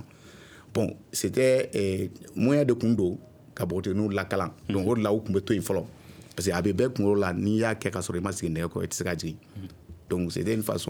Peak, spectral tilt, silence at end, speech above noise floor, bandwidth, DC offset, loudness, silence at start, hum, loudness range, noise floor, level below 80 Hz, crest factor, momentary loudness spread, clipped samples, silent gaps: -10 dBFS; -6 dB/octave; 0 s; 23 dB; over 20 kHz; under 0.1%; -27 LUFS; 0 s; none; 3 LU; -50 dBFS; -56 dBFS; 18 dB; 11 LU; under 0.1%; none